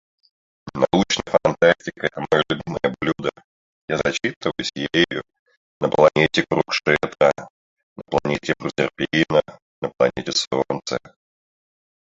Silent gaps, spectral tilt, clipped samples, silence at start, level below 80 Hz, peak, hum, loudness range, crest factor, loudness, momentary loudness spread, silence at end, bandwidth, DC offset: 3.44-3.88 s, 4.36-4.41 s, 5.39-5.46 s, 5.57-5.81 s, 7.50-7.77 s, 7.83-7.96 s, 9.62-9.82 s, 10.47-10.51 s; -4.5 dB/octave; under 0.1%; 0.65 s; -52 dBFS; -2 dBFS; none; 4 LU; 20 dB; -21 LUFS; 10 LU; 1.05 s; 7.8 kHz; under 0.1%